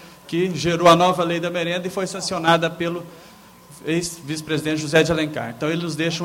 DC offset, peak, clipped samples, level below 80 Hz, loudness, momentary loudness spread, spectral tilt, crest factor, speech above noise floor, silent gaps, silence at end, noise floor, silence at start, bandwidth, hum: under 0.1%; -2 dBFS; under 0.1%; -52 dBFS; -21 LUFS; 12 LU; -4.5 dB/octave; 18 dB; 25 dB; none; 0 s; -45 dBFS; 0 s; 16.5 kHz; none